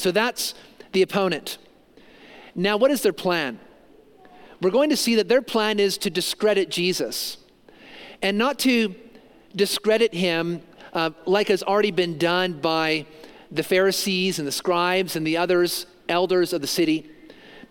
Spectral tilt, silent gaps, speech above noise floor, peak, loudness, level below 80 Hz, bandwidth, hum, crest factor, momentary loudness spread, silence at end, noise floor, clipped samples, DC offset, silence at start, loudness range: -4 dB/octave; none; 30 dB; -6 dBFS; -22 LUFS; -64 dBFS; 17 kHz; none; 18 dB; 10 LU; 0.05 s; -52 dBFS; under 0.1%; under 0.1%; 0 s; 3 LU